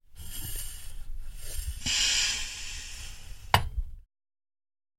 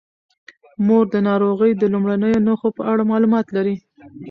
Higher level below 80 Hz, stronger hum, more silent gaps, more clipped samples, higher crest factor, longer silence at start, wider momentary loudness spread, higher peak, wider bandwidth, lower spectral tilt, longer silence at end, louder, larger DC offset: first, -40 dBFS vs -56 dBFS; neither; neither; neither; first, 30 dB vs 12 dB; second, 0.1 s vs 0.8 s; first, 22 LU vs 6 LU; first, -2 dBFS vs -6 dBFS; first, 16.5 kHz vs 5.6 kHz; second, -1 dB/octave vs -9.5 dB/octave; first, 1 s vs 0 s; second, -29 LUFS vs -18 LUFS; neither